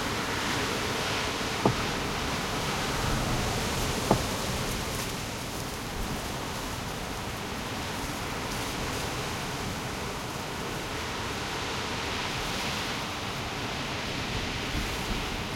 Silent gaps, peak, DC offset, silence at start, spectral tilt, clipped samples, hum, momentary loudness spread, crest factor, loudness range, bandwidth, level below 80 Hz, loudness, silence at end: none; -6 dBFS; under 0.1%; 0 s; -3.5 dB/octave; under 0.1%; none; 6 LU; 26 dB; 4 LU; 16.5 kHz; -42 dBFS; -31 LUFS; 0 s